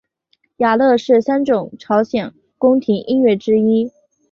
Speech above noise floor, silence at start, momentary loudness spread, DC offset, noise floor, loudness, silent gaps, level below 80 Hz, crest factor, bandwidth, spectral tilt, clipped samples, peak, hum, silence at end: 49 dB; 0.6 s; 7 LU; under 0.1%; -64 dBFS; -16 LUFS; none; -58 dBFS; 14 dB; 7 kHz; -7 dB/octave; under 0.1%; -2 dBFS; none; 0.4 s